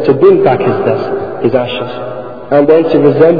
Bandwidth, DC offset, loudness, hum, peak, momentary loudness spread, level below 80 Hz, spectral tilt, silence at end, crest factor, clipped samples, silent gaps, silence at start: 5 kHz; 2%; -10 LUFS; none; 0 dBFS; 13 LU; -48 dBFS; -10 dB/octave; 0 s; 10 dB; 1%; none; 0 s